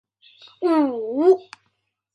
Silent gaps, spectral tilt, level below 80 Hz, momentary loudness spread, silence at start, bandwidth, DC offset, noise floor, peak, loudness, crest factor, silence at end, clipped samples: none; -6 dB/octave; -78 dBFS; 5 LU; 0.6 s; 6.6 kHz; under 0.1%; -72 dBFS; -6 dBFS; -20 LUFS; 16 dB; 0.7 s; under 0.1%